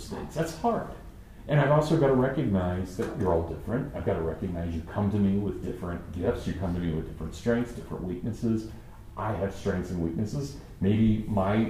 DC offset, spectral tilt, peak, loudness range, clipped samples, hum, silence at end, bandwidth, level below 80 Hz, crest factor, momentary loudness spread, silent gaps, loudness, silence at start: under 0.1%; -8 dB/octave; -10 dBFS; 5 LU; under 0.1%; none; 0 s; 15.5 kHz; -44 dBFS; 18 dB; 12 LU; none; -29 LUFS; 0 s